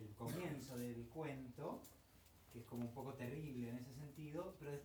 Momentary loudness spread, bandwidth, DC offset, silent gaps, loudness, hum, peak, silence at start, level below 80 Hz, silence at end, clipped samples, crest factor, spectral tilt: 12 LU; over 20 kHz; under 0.1%; none; -50 LUFS; none; -34 dBFS; 0 s; -72 dBFS; 0 s; under 0.1%; 16 dB; -6.5 dB/octave